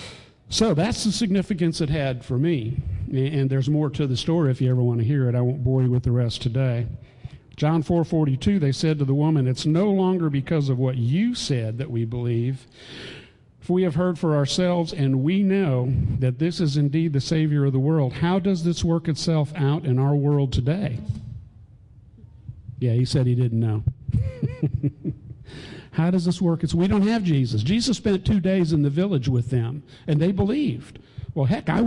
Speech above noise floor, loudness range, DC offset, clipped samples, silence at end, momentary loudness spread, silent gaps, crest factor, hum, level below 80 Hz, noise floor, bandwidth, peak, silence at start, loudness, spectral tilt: 27 dB; 4 LU; under 0.1%; under 0.1%; 0 s; 12 LU; none; 12 dB; none; -44 dBFS; -49 dBFS; 11 kHz; -10 dBFS; 0 s; -23 LUFS; -7 dB/octave